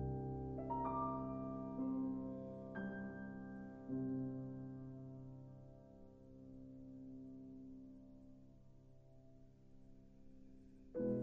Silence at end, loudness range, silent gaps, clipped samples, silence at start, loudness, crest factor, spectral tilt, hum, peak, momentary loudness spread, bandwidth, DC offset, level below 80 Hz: 0 s; 15 LU; none; under 0.1%; 0 s; -47 LUFS; 16 dB; -9.5 dB/octave; none; -30 dBFS; 23 LU; 3.4 kHz; under 0.1%; -64 dBFS